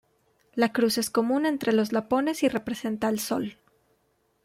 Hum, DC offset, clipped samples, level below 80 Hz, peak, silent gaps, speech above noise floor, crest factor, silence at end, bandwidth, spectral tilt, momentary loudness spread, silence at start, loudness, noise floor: none; under 0.1%; under 0.1%; -64 dBFS; -10 dBFS; none; 45 dB; 16 dB; 0.9 s; 16.5 kHz; -4 dB/octave; 7 LU; 0.55 s; -26 LUFS; -70 dBFS